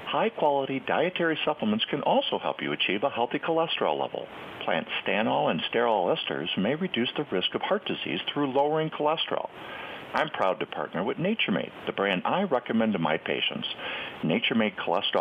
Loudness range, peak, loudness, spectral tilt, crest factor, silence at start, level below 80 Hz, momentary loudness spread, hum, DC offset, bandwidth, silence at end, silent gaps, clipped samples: 2 LU; -10 dBFS; -27 LUFS; -7 dB/octave; 18 dB; 0 s; -70 dBFS; 7 LU; none; under 0.1%; 6.4 kHz; 0 s; none; under 0.1%